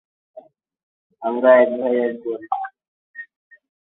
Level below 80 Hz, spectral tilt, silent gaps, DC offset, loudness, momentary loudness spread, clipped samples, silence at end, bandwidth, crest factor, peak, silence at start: -72 dBFS; -9 dB/octave; 0.83-1.10 s, 2.88-3.14 s; under 0.1%; -19 LUFS; 25 LU; under 0.1%; 0.65 s; 4 kHz; 20 dB; -2 dBFS; 0.35 s